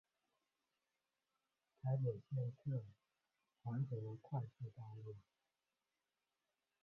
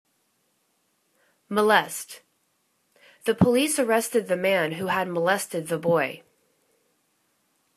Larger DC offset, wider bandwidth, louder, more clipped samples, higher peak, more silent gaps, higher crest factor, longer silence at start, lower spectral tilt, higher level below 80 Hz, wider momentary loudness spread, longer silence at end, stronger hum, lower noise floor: neither; second, 3.3 kHz vs 14 kHz; second, -46 LUFS vs -24 LUFS; neither; second, -30 dBFS vs -2 dBFS; neither; second, 18 dB vs 24 dB; first, 1.85 s vs 1.5 s; first, -11 dB/octave vs -4.5 dB/octave; second, -82 dBFS vs -62 dBFS; about the same, 13 LU vs 13 LU; about the same, 1.6 s vs 1.6 s; first, 50 Hz at -70 dBFS vs none; first, under -90 dBFS vs -71 dBFS